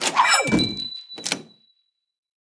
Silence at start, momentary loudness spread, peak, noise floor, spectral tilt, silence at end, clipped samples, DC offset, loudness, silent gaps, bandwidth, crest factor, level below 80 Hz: 0 s; 13 LU; -4 dBFS; -69 dBFS; -2.5 dB/octave; 1.05 s; under 0.1%; under 0.1%; -21 LUFS; none; 10.5 kHz; 20 dB; -52 dBFS